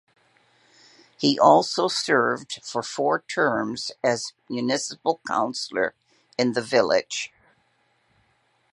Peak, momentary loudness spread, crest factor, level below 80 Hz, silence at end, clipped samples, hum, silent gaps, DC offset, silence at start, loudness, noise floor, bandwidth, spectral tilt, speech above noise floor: -2 dBFS; 12 LU; 22 dB; -70 dBFS; 1.45 s; under 0.1%; none; none; under 0.1%; 1.2 s; -23 LUFS; -67 dBFS; 11.5 kHz; -3.5 dB/octave; 44 dB